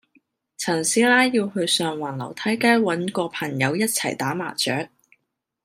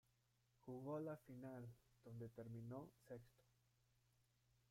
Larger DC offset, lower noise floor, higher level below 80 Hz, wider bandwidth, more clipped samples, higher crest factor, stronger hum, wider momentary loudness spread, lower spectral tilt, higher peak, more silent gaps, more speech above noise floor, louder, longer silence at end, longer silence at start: neither; second, -73 dBFS vs -83 dBFS; first, -70 dBFS vs -84 dBFS; about the same, 16 kHz vs 16 kHz; neither; about the same, 20 dB vs 18 dB; neither; about the same, 11 LU vs 11 LU; second, -3.5 dB/octave vs -8.5 dB/octave; first, -4 dBFS vs -40 dBFS; neither; first, 51 dB vs 28 dB; first, -22 LUFS vs -56 LUFS; second, 0.8 s vs 1.3 s; about the same, 0.6 s vs 0.65 s